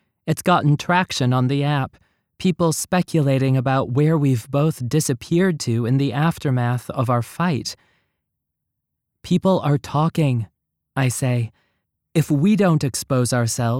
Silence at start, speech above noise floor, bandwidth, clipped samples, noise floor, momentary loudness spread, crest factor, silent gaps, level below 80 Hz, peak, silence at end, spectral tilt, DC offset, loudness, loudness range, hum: 0.25 s; 60 dB; 16.5 kHz; under 0.1%; -79 dBFS; 7 LU; 16 dB; none; -54 dBFS; -4 dBFS; 0 s; -6 dB/octave; under 0.1%; -20 LUFS; 4 LU; none